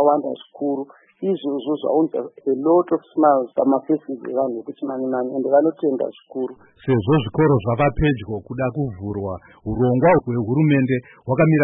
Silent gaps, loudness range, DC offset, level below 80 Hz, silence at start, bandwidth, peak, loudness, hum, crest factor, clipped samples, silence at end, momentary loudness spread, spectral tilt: none; 2 LU; under 0.1%; -44 dBFS; 0 s; 3.8 kHz; -4 dBFS; -21 LUFS; none; 16 dB; under 0.1%; 0 s; 12 LU; -13 dB/octave